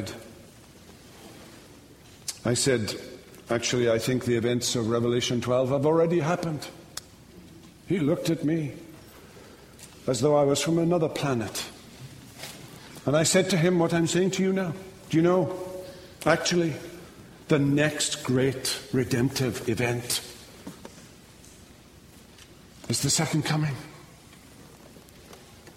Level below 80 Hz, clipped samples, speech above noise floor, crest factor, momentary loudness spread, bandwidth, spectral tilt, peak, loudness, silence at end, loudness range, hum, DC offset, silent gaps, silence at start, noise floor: -58 dBFS; under 0.1%; 26 dB; 22 dB; 22 LU; 16 kHz; -4.5 dB/octave; -6 dBFS; -25 LUFS; 0.05 s; 7 LU; none; under 0.1%; none; 0 s; -51 dBFS